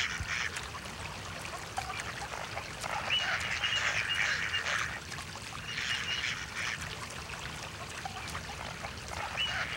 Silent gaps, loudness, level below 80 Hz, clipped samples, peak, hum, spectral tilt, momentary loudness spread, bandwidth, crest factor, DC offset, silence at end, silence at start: none; -34 LUFS; -54 dBFS; under 0.1%; -18 dBFS; none; -1.5 dB/octave; 11 LU; over 20 kHz; 18 dB; under 0.1%; 0 s; 0 s